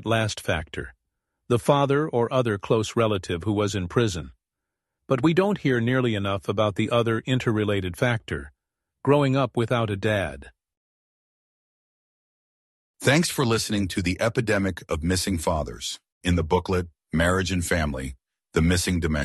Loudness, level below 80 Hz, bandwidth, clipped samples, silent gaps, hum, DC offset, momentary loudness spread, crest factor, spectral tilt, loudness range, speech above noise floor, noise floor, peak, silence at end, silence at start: -24 LUFS; -42 dBFS; 12.5 kHz; under 0.1%; 10.77-12.94 s, 16.12-16.21 s; none; under 0.1%; 9 LU; 20 dB; -5.5 dB/octave; 4 LU; 62 dB; -85 dBFS; -4 dBFS; 0 s; 0 s